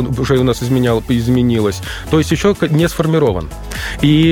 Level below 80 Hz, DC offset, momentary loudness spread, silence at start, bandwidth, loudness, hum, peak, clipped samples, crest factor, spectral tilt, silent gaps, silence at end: -30 dBFS; under 0.1%; 10 LU; 0 s; 17 kHz; -15 LUFS; none; -2 dBFS; under 0.1%; 12 dB; -6.5 dB/octave; none; 0 s